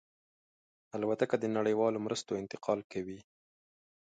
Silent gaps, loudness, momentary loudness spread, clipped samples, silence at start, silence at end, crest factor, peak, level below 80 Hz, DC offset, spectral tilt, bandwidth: 2.84-2.90 s; -34 LUFS; 12 LU; under 0.1%; 0.95 s; 0.95 s; 22 dB; -14 dBFS; -74 dBFS; under 0.1%; -5.5 dB/octave; 9.2 kHz